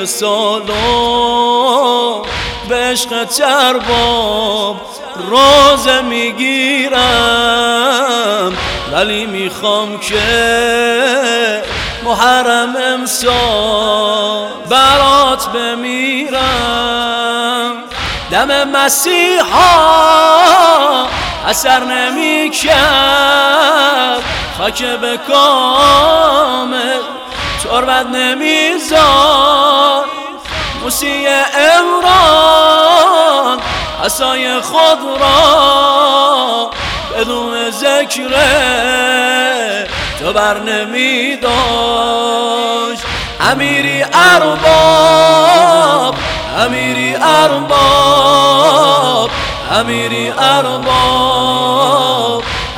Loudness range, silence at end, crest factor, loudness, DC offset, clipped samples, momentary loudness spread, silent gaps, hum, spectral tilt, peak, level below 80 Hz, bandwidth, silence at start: 4 LU; 0 s; 10 dB; -10 LUFS; under 0.1%; 0.9%; 9 LU; none; none; -2.5 dB/octave; 0 dBFS; -34 dBFS; over 20 kHz; 0 s